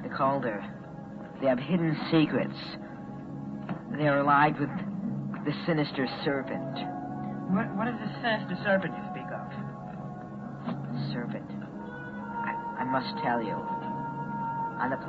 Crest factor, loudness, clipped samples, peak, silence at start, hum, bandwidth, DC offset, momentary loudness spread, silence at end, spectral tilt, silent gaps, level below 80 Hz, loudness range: 20 dB; -31 LUFS; under 0.1%; -10 dBFS; 0 s; none; 7.2 kHz; under 0.1%; 14 LU; 0 s; -8.5 dB/octave; none; -62 dBFS; 7 LU